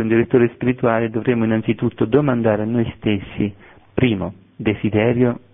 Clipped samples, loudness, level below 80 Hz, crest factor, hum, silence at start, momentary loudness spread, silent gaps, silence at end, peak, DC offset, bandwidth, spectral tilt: under 0.1%; -19 LUFS; -48 dBFS; 16 dB; none; 0 s; 8 LU; none; 0.15 s; -2 dBFS; under 0.1%; 3.8 kHz; -12 dB/octave